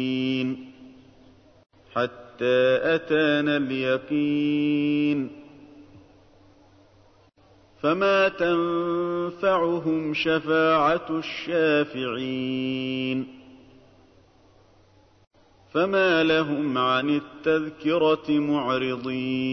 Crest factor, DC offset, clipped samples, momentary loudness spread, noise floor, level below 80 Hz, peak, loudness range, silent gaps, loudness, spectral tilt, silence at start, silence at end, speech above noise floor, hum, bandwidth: 16 dB; under 0.1%; under 0.1%; 8 LU; -57 dBFS; -62 dBFS; -10 dBFS; 8 LU; 15.27-15.31 s; -24 LUFS; -7 dB/octave; 0 s; 0 s; 34 dB; none; 6.4 kHz